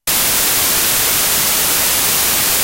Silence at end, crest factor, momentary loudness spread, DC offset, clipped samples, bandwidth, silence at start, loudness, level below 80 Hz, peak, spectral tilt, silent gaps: 0 s; 14 dB; 0 LU; under 0.1%; under 0.1%; 16.5 kHz; 0.05 s; -11 LUFS; -38 dBFS; 0 dBFS; 0 dB/octave; none